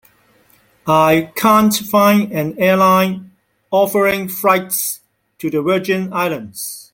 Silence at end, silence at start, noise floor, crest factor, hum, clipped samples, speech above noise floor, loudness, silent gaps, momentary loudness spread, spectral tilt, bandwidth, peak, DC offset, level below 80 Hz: 0.1 s; 0.85 s; -54 dBFS; 16 dB; none; under 0.1%; 39 dB; -15 LUFS; none; 13 LU; -4.5 dB/octave; 17 kHz; 0 dBFS; under 0.1%; -56 dBFS